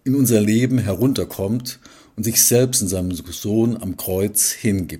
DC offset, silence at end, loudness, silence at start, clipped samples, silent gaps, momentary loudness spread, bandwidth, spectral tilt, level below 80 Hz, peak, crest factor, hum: under 0.1%; 0 s; -18 LUFS; 0.05 s; under 0.1%; none; 12 LU; 16.5 kHz; -4.5 dB/octave; -48 dBFS; 0 dBFS; 18 dB; none